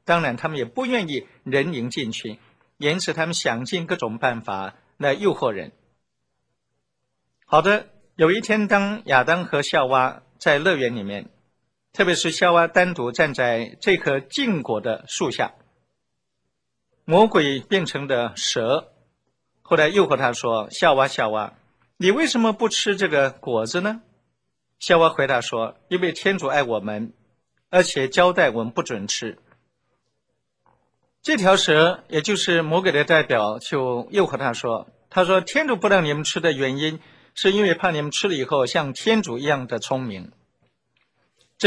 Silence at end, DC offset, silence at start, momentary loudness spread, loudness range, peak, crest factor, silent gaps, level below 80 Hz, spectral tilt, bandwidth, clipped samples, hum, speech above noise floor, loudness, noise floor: 0 s; under 0.1%; 0.05 s; 10 LU; 5 LU; -2 dBFS; 20 dB; none; -60 dBFS; -4 dB/octave; 10.5 kHz; under 0.1%; none; 58 dB; -21 LUFS; -78 dBFS